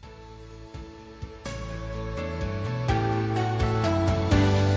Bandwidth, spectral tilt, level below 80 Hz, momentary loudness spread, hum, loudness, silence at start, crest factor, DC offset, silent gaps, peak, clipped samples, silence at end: 8 kHz; -7 dB/octave; -36 dBFS; 21 LU; none; -27 LUFS; 0.05 s; 18 dB; under 0.1%; none; -10 dBFS; under 0.1%; 0 s